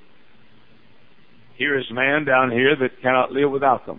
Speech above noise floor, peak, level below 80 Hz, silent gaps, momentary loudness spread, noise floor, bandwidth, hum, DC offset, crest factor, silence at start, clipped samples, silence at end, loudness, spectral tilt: 36 dB; -4 dBFS; -62 dBFS; none; 5 LU; -55 dBFS; 4 kHz; none; 0.5%; 18 dB; 1.6 s; under 0.1%; 0.05 s; -19 LUFS; -9 dB/octave